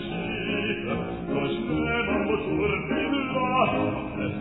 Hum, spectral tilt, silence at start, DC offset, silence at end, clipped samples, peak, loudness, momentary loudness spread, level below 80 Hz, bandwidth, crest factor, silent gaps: none; -10 dB/octave; 0 s; 0.1%; 0 s; under 0.1%; -10 dBFS; -26 LUFS; 7 LU; -46 dBFS; 4.1 kHz; 16 dB; none